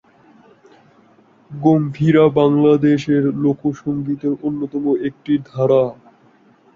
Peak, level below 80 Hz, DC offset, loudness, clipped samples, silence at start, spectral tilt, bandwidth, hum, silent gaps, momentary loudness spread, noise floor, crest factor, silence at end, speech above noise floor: -2 dBFS; -56 dBFS; under 0.1%; -17 LUFS; under 0.1%; 1.5 s; -9 dB/octave; 7.2 kHz; none; none; 9 LU; -52 dBFS; 16 dB; 0.8 s; 36 dB